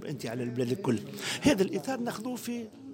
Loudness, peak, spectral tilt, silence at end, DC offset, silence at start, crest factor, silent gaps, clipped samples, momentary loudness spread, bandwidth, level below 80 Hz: -31 LUFS; -12 dBFS; -5 dB/octave; 0 s; under 0.1%; 0 s; 20 dB; none; under 0.1%; 10 LU; 16.5 kHz; -62 dBFS